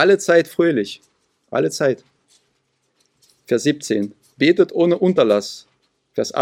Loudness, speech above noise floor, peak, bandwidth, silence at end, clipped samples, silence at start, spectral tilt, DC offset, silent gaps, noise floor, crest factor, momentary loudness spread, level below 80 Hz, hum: -18 LUFS; 51 dB; 0 dBFS; 15.5 kHz; 0 s; under 0.1%; 0 s; -5 dB/octave; under 0.1%; none; -68 dBFS; 18 dB; 14 LU; -68 dBFS; none